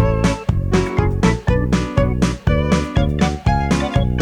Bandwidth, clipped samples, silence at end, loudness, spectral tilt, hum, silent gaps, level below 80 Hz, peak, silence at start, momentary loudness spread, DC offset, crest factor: 12.5 kHz; under 0.1%; 0 s; -18 LUFS; -6.5 dB/octave; none; none; -24 dBFS; -2 dBFS; 0 s; 2 LU; under 0.1%; 14 dB